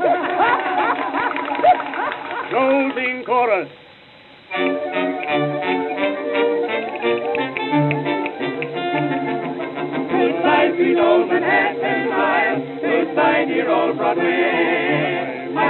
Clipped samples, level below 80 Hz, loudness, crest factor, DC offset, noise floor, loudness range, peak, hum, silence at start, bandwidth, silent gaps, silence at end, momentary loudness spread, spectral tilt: under 0.1%; -64 dBFS; -19 LUFS; 16 dB; under 0.1%; -45 dBFS; 4 LU; -4 dBFS; none; 0 s; 4.3 kHz; none; 0 s; 8 LU; -9 dB/octave